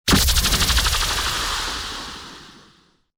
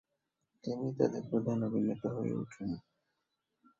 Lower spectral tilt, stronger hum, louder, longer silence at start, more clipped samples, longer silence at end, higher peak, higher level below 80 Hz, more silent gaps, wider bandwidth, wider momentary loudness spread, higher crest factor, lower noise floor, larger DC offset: second, -2 dB/octave vs -9 dB/octave; neither; first, -19 LUFS vs -36 LUFS; second, 0.05 s vs 0.65 s; neither; second, 0.65 s vs 1 s; first, -6 dBFS vs -14 dBFS; first, -28 dBFS vs -70 dBFS; neither; first, over 20 kHz vs 7.4 kHz; first, 17 LU vs 9 LU; second, 16 dB vs 24 dB; second, -56 dBFS vs -85 dBFS; neither